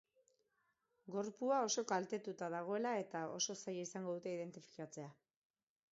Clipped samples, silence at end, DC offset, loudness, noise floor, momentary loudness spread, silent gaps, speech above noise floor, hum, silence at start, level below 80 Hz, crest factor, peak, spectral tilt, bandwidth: under 0.1%; 0.8 s; under 0.1%; -42 LUFS; -84 dBFS; 13 LU; none; 41 dB; none; 1.05 s; under -90 dBFS; 20 dB; -24 dBFS; -3.5 dB/octave; 7.6 kHz